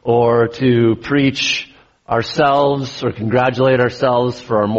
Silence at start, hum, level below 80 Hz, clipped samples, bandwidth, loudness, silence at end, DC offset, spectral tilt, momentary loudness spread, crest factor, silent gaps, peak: 0.05 s; none; -48 dBFS; under 0.1%; 8 kHz; -16 LUFS; 0 s; under 0.1%; -4.5 dB/octave; 7 LU; 14 dB; none; -2 dBFS